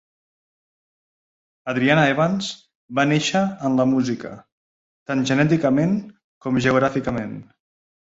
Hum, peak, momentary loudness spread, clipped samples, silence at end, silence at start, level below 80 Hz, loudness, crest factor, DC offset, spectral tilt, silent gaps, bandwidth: none; -2 dBFS; 15 LU; under 0.1%; 0.6 s; 1.65 s; -56 dBFS; -20 LUFS; 20 dB; under 0.1%; -6 dB/octave; 2.75-2.88 s, 4.52-5.06 s, 6.24-6.41 s; 8 kHz